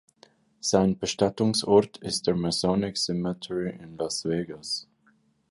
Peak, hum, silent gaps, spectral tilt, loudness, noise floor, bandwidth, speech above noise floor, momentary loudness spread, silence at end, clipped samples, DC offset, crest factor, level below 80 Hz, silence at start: -6 dBFS; none; none; -4.5 dB/octave; -26 LUFS; -65 dBFS; 11.5 kHz; 39 dB; 10 LU; 0.65 s; under 0.1%; under 0.1%; 20 dB; -56 dBFS; 0.65 s